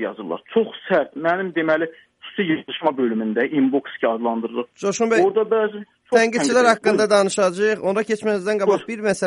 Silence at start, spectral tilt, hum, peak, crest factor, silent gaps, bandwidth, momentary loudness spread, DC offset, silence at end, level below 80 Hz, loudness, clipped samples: 0 s; -4.5 dB/octave; none; -2 dBFS; 18 dB; none; 11.5 kHz; 9 LU; under 0.1%; 0 s; -68 dBFS; -20 LUFS; under 0.1%